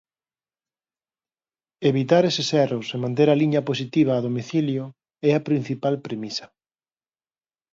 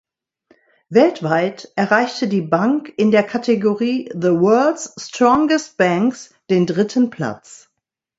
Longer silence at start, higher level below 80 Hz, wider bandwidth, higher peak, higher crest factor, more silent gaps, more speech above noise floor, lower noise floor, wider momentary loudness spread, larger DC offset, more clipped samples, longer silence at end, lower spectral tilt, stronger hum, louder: first, 1.8 s vs 0.9 s; second, -70 dBFS vs -60 dBFS; about the same, 7.8 kHz vs 8 kHz; second, -4 dBFS vs 0 dBFS; about the same, 20 dB vs 18 dB; neither; first, over 69 dB vs 61 dB; first, under -90 dBFS vs -77 dBFS; first, 11 LU vs 8 LU; neither; neither; first, 1.25 s vs 0.65 s; about the same, -6.5 dB/octave vs -6 dB/octave; neither; second, -22 LUFS vs -17 LUFS